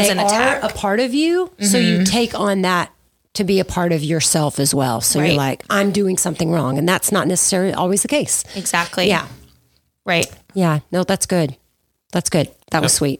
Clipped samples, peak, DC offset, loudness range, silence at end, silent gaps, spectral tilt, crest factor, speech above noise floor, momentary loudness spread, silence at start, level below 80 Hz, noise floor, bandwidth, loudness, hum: under 0.1%; 0 dBFS; under 0.1%; 3 LU; 0.05 s; none; -4 dB/octave; 18 dB; 48 dB; 6 LU; 0 s; -48 dBFS; -65 dBFS; 19 kHz; -17 LUFS; none